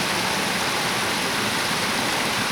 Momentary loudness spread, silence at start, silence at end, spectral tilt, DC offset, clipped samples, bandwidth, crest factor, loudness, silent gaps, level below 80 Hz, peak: 0 LU; 0 s; 0 s; -2 dB/octave; under 0.1%; under 0.1%; over 20 kHz; 12 dB; -22 LUFS; none; -54 dBFS; -10 dBFS